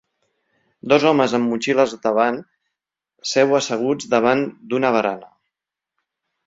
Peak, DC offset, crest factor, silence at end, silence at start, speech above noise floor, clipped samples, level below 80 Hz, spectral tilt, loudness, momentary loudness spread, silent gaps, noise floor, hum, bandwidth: -2 dBFS; under 0.1%; 18 dB; 1.2 s; 0.85 s; 67 dB; under 0.1%; -64 dBFS; -4.5 dB/octave; -19 LUFS; 8 LU; none; -85 dBFS; none; 7.8 kHz